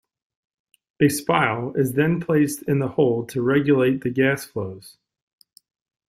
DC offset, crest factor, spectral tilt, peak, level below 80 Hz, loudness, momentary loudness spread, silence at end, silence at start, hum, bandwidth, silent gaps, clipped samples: under 0.1%; 18 dB; -6 dB/octave; -4 dBFS; -60 dBFS; -21 LUFS; 8 LU; 1.2 s; 1 s; none; 16 kHz; none; under 0.1%